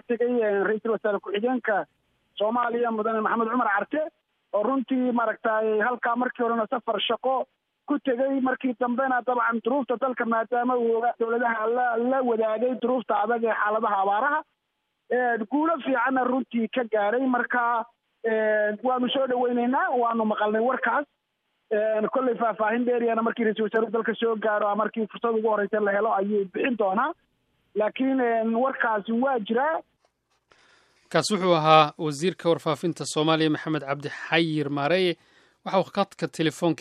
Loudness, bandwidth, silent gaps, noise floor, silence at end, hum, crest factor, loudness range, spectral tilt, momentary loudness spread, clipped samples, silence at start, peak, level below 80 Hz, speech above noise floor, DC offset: -25 LUFS; 12.5 kHz; none; -78 dBFS; 0.05 s; none; 22 dB; 2 LU; -5.5 dB/octave; 5 LU; under 0.1%; 0.1 s; -2 dBFS; -78 dBFS; 53 dB; under 0.1%